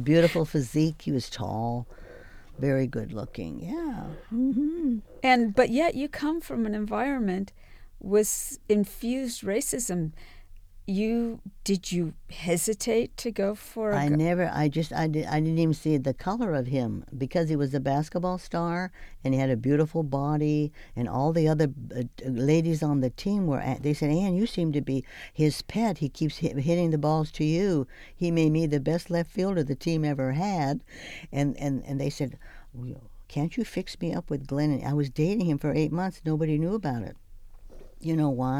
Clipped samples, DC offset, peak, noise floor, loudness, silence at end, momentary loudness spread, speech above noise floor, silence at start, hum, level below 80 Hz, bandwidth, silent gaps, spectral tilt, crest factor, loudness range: under 0.1%; under 0.1%; -8 dBFS; -46 dBFS; -27 LUFS; 0 s; 10 LU; 20 dB; 0 s; none; -48 dBFS; 16.5 kHz; none; -6.5 dB/octave; 20 dB; 4 LU